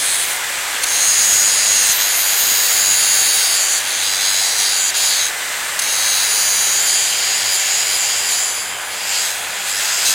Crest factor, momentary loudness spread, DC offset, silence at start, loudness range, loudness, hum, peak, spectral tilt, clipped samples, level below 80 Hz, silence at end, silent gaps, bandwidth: 14 dB; 8 LU; under 0.1%; 0 s; 3 LU; -13 LUFS; none; -2 dBFS; 3.5 dB/octave; under 0.1%; -58 dBFS; 0 s; none; 16.5 kHz